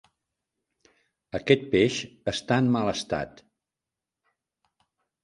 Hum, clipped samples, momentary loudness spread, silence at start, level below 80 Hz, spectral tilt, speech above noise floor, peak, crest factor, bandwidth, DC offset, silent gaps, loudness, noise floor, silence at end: none; under 0.1%; 11 LU; 1.35 s; -58 dBFS; -5.5 dB/octave; 64 dB; -4 dBFS; 24 dB; 11 kHz; under 0.1%; none; -26 LUFS; -89 dBFS; 1.95 s